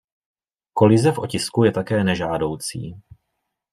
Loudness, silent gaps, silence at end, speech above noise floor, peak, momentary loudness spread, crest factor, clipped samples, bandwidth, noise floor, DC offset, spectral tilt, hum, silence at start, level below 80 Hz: -20 LUFS; none; 0.7 s; 58 dB; -2 dBFS; 14 LU; 18 dB; under 0.1%; 15 kHz; -77 dBFS; under 0.1%; -6 dB/octave; none; 0.75 s; -54 dBFS